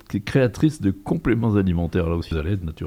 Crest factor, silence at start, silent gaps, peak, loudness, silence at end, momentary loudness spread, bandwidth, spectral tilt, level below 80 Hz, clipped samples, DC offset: 16 dB; 0.1 s; none; -6 dBFS; -22 LUFS; 0 s; 6 LU; 16 kHz; -8 dB/octave; -40 dBFS; under 0.1%; under 0.1%